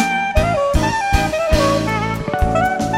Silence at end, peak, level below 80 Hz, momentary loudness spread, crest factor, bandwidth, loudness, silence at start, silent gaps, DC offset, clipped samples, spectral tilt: 0 s; -2 dBFS; -24 dBFS; 4 LU; 16 dB; 16 kHz; -17 LUFS; 0 s; none; under 0.1%; under 0.1%; -5.5 dB/octave